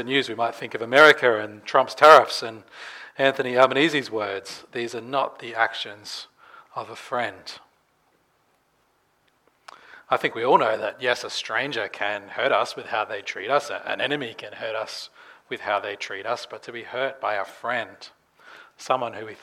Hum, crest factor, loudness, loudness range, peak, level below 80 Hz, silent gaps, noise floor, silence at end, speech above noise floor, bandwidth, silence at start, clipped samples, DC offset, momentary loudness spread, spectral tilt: none; 24 dB; -22 LUFS; 15 LU; 0 dBFS; -78 dBFS; none; -66 dBFS; 0.05 s; 43 dB; 16.5 kHz; 0 s; under 0.1%; under 0.1%; 20 LU; -3.5 dB/octave